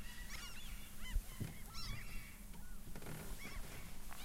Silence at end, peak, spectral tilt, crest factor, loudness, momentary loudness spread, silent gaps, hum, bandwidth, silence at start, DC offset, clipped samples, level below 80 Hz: 0 s; -26 dBFS; -3.5 dB/octave; 18 dB; -51 LUFS; 7 LU; none; none; 16 kHz; 0 s; under 0.1%; under 0.1%; -50 dBFS